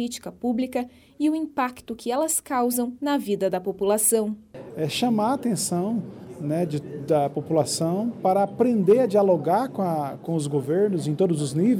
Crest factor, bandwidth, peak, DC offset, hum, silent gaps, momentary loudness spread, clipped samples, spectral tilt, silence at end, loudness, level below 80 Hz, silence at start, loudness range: 16 dB; 17.5 kHz; -8 dBFS; under 0.1%; none; none; 11 LU; under 0.1%; -5.5 dB/octave; 0 s; -24 LUFS; -64 dBFS; 0 s; 4 LU